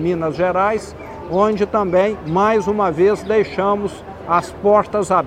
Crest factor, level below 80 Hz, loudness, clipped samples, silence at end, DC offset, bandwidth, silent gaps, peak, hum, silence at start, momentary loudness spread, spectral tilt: 16 dB; -44 dBFS; -17 LUFS; under 0.1%; 0 s; under 0.1%; 10.5 kHz; none; -2 dBFS; none; 0 s; 8 LU; -6.5 dB/octave